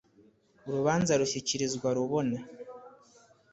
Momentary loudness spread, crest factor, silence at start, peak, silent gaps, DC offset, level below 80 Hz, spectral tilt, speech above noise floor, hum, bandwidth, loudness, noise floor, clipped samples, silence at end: 20 LU; 20 dB; 0.65 s; -12 dBFS; none; under 0.1%; -64 dBFS; -4.5 dB/octave; 34 dB; none; 8.4 kHz; -30 LUFS; -63 dBFS; under 0.1%; 0.6 s